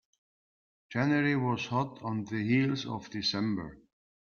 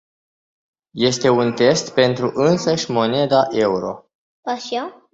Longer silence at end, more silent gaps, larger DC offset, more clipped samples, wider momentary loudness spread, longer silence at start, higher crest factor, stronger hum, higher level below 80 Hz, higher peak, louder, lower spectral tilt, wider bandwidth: first, 0.55 s vs 0.2 s; second, none vs 4.15-4.43 s; neither; neither; about the same, 10 LU vs 11 LU; about the same, 0.9 s vs 0.95 s; about the same, 16 dB vs 18 dB; neither; second, -66 dBFS vs -58 dBFS; second, -16 dBFS vs -2 dBFS; second, -31 LUFS vs -18 LUFS; about the same, -6 dB/octave vs -5 dB/octave; second, 7 kHz vs 8 kHz